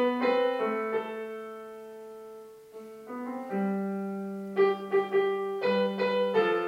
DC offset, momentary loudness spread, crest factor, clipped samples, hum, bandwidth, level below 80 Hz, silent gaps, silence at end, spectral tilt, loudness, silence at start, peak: under 0.1%; 19 LU; 16 dB; under 0.1%; none; 15.5 kHz; -82 dBFS; none; 0 s; -7 dB/octave; -29 LUFS; 0 s; -14 dBFS